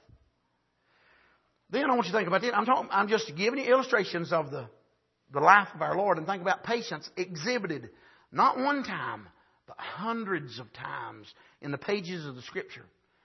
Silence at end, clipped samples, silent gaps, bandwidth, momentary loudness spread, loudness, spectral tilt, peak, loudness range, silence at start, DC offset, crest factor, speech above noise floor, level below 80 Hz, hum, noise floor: 0.45 s; under 0.1%; none; 6.2 kHz; 16 LU; -29 LUFS; -5 dB/octave; -4 dBFS; 10 LU; 1.7 s; under 0.1%; 26 dB; 46 dB; -74 dBFS; none; -75 dBFS